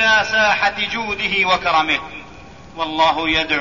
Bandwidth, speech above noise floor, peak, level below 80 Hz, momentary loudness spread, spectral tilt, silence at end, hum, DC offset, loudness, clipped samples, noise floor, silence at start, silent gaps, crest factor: 7.4 kHz; 21 dB; -2 dBFS; -44 dBFS; 12 LU; -2.5 dB/octave; 0 s; none; 0.5%; -17 LUFS; under 0.1%; -39 dBFS; 0 s; none; 16 dB